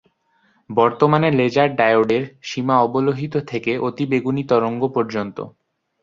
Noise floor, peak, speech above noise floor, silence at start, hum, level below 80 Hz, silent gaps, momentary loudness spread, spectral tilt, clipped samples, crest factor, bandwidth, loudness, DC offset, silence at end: -62 dBFS; -2 dBFS; 43 dB; 0.7 s; none; -60 dBFS; none; 10 LU; -7 dB/octave; under 0.1%; 18 dB; 7.4 kHz; -19 LUFS; under 0.1%; 0.55 s